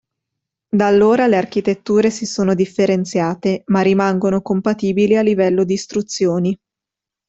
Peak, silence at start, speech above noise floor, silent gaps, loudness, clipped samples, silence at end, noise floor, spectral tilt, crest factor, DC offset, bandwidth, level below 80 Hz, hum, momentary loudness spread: -2 dBFS; 0.75 s; 70 dB; none; -16 LUFS; under 0.1%; 0.75 s; -86 dBFS; -6 dB/octave; 14 dB; under 0.1%; 8 kHz; -56 dBFS; none; 7 LU